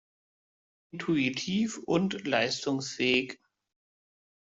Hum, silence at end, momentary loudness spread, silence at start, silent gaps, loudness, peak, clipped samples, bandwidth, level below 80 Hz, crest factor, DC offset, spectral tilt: none; 1.25 s; 12 LU; 0.95 s; none; -29 LUFS; -12 dBFS; under 0.1%; 8.2 kHz; -70 dBFS; 20 dB; under 0.1%; -4.5 dB/octave